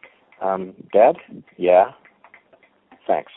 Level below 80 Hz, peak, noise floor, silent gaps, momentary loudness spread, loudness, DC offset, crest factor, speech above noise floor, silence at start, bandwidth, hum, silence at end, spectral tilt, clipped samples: -66 dBFS; -2 dBFS; -57 dBFS; none; 13 LU; -19 LUFS; under 0.1%; 20 dB; 38 dB; 0.4 s; 4 kHz; none; 0.15 s; -10.5 dB/octave; under 0.1%